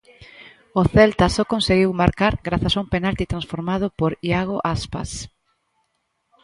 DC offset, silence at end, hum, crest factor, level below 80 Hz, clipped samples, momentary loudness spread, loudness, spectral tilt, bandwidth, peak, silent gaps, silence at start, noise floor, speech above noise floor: under 0.1%; 1.15 s; none; 20 dB; -36 dBFS; under 0.1%; 12 LU; -20 LUFS; -6 dB/octave; 11.5 kHz; 0 dBFS; none; 0.2 s; -72 dBFS; 52 dB